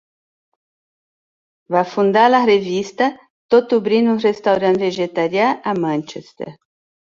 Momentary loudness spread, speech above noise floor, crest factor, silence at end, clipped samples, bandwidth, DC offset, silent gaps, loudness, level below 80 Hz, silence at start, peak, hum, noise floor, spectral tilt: 12 LU; over 74 dB; 16 dB; 0.6 s; under 0.1%; 7.6 kHz; under 0.1%; 3.30-3.49 s; -17 LUFS; -64 dBFS; 1.7 s; -2 dBFS; none; under -90 dBFS; -6 dB/octave